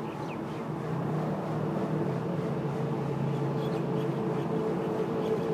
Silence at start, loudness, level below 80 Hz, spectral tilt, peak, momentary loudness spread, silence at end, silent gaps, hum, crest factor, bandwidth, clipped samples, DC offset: 0 s; -31 LUFS; -62 dBFS; -8.5 dB/octave; -18 dBFS; 5 LU; 0 s; none; none; 12 dB; 14.5 kHz; under 0.1%; under 0.1%